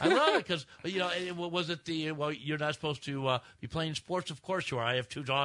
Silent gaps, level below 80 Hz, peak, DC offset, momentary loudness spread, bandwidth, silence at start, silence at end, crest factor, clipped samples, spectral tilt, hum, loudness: none; -66 dBFS; -12 dBFS; under 0.1%; 7 LU; 11 kHz; 0 s; 0 s; 22 dB; under 0.1%; -5 dB/octave; none; -33 LUFS